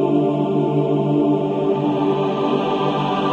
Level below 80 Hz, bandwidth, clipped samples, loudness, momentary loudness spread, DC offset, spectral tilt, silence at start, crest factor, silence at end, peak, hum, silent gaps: -58 dBFS; 7.2 kHz; under 0.1%; -19 LUFS; 2 LU; under 0.1%; -8.5 dB/octave; 0 s; 12 dB; 0 s; -6 dBFS; none; none